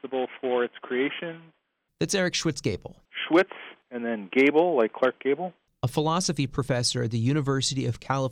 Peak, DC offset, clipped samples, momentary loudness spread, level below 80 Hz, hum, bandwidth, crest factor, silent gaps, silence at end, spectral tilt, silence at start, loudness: -10 dBFS; under 0.1%; under 0.1%; 12 LU; -56 dBFS; none; 15.5 kHz; 16 dB; none; 0 s; -5 dB/octave; 0.05 s; -26 LUFS